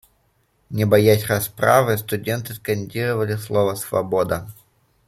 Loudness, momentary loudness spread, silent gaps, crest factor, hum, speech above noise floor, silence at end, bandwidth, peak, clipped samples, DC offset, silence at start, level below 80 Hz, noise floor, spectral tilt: -20 LUFS; 10 LU; none; 18 dB; none; 44 dB; 0.55 s; 16 kHz; -2 dBFS; under 0.1%; under 0.1%; 0.7 s; -54 dBFS; -64 dBFS; -5.5 dB/octave